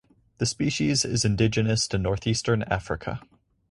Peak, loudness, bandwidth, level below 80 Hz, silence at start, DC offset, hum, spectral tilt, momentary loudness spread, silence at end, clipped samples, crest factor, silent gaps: -8 dBFS; -25 LUFS; 11.5 kHz; -44 dBFS; 0.4 s; under 0.1%; none; -4.5 dB/octave; 9 LU; 0.5 s; under 0.1%; 18 dB; none